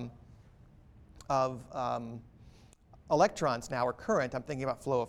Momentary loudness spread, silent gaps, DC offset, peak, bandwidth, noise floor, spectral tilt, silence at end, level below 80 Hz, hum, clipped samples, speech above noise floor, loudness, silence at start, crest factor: 16 LU; none; under 0.1%; -12 dBFS; 14.5 kHz; -58 dBFS; -5.5 dB/octave; 0 s; -60 dBFS; none; under 0.1%; 27 dB; -32 LUFS; 0 s; 22 dB